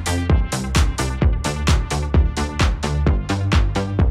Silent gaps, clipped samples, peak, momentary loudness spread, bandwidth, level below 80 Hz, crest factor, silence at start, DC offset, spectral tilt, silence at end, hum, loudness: none; under 0.1%; -6 dBFS; 2 LU; 14 kHz; -22 dBFS; 12 dB; 0 s; under 0.1%; -5.5 dB/octave; 0 s; none; -20 LUFS